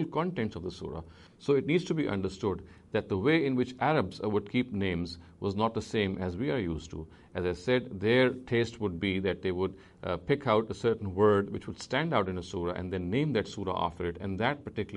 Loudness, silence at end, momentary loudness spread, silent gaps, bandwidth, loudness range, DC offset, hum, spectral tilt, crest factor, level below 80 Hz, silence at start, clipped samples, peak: -31 LUFS; 0 s; 10 LU; none; 10.5 kHz; 3 LU; under 0.1%; none; -6.5 dB/octave; 18 dB; -56 dBFS; 0 s; under 0.1%; -12 dBFS